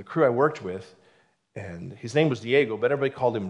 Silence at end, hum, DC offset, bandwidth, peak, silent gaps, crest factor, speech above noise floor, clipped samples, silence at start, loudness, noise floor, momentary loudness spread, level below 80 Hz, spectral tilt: 0 s; none; under 0.1%; 10.5 kHz; -8 dBFS; none; 18 dB; 38 dB; under 0.1%; 0 s; -24 LUFS; -63 dBFS; 17 LU; -72 dBFS; -6.5 dB/octave